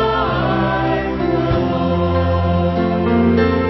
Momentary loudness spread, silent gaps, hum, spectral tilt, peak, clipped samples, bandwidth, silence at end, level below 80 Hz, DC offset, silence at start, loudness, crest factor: 4 LU; none; none; -9 dB/octave; -2 dBFS; under 0.1%; 6 kHz; 0 s; -28 dBFS; under 0.1%; 0 s; -17 LUFS; 14 dB